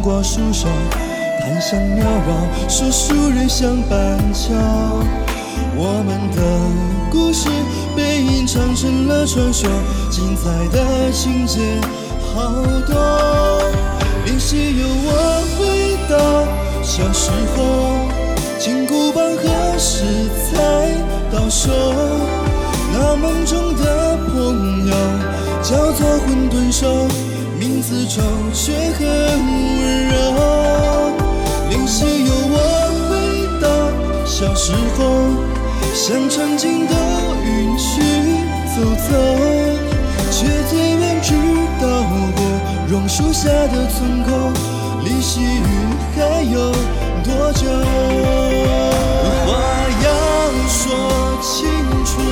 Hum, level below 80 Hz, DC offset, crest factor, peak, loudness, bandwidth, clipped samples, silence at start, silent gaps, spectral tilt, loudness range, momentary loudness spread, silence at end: none; -20 dBFS; under 0.1%; 12 dB; -2 dBFS; -16 LUFS; 16 kHz; under 0.1%; 0 s; none; -5 dB/octave; 2 LU; 4 LU; 0 s